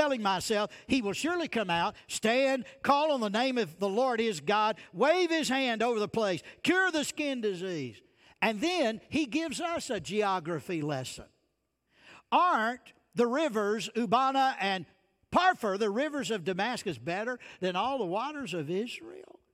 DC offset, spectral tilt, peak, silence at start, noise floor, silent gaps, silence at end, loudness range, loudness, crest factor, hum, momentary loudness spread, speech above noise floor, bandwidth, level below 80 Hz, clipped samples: under 0.1%; -4 dB/octave; -12 dBFS; 0 s; -78 dBFS; none; 0.3 s; 4 LU; -30 LUFS; 18 dB; none; 8 LU; 48 dB; 16 kHz; -68 dBFS; under 0.1%